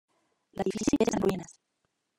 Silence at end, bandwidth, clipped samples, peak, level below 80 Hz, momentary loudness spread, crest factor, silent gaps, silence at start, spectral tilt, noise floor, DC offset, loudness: 0.65 s; 16 kHz; under 0.1%; -12 dBFS; -56 dBFS; 18 LU; 20 dB; none; 0.55 s; -5.5 dB/octave; -79 dBFS; under 0.1%; -29 LUFS